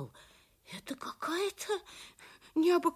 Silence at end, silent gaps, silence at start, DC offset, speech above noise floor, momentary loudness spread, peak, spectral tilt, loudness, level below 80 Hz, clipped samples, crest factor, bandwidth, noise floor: 0 s; none; 0 s; under 0.1%; 28 dB; 21 LU; -16 dBFS; -4 dB/octave; -34 LUFS; -72 dBFS; under 0.1%; 18 dB; 15.5 kHz; -61 dBFS